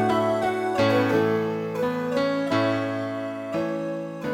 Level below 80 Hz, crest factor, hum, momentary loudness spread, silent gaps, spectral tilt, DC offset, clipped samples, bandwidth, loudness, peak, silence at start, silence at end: -60 dBFS; 16 dB; none; 8 LU; none; -6.5 dB/octave; under 0.1%; under 0.1%; 16.5 kHz; -25 LUFS; -8 dBFS; 0 s; 0 s